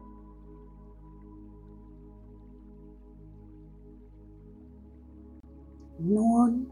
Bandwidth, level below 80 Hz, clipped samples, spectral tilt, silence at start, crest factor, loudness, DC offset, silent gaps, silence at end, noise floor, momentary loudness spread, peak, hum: 10.5 kHz; -52 dBFS; under 0.1%; -10 dB/octave; 0 s; 22 dB; -25 LUFS; under 0.1%; none; 0 s; -50 dBFS; 27 LU; -12 dBFS; none